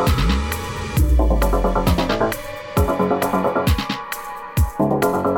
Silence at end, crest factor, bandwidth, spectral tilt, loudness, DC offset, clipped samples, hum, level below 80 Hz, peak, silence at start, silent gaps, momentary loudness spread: 0 s; 14 dB; 19.5 kHz; -6 dB/octave; -20 LUFS; under 0.1%; under 0.1%; none; -24 dBFS; -4 dBFS; 0 s; none; 8 LU